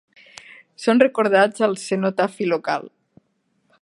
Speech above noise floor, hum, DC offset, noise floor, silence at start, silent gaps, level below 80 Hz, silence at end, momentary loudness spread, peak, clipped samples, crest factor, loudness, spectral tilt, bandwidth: 49 dB; none; under 0.1%; -68 dBFS; 0.8 s; none; -74 dBFS; 0.95 s; 9 LU; -2 dBFS; under 0.1%; 20 dB; -20 LUFS; -5 dB/octave; 11.5 kHz